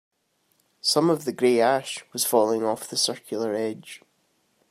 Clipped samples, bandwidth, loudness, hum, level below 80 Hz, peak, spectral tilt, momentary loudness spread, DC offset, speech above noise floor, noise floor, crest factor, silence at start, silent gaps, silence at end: under 0.1%; 16 kHz; -24 LUFS; none; -78 dBFS; -6 dBFS; -3.5 dB/octave; 11 LU; under 0.1%; 45 dB; -69 dBFS; 20 dB; 0.85 s; none; 0.75 s